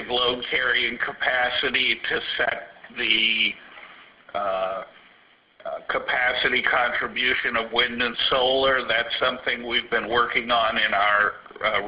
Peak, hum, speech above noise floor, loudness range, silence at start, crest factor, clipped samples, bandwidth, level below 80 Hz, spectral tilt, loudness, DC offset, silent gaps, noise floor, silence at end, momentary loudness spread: -4 dBFS; none; 33 dB; 4 LU; 0 s; 20 dB; under 0.1%; 5.4 kHz; -54 dBFS; -7 dB/octave; -22 LUFS; under 0.1%; none; -57 dBFS; 0 s; 8 LU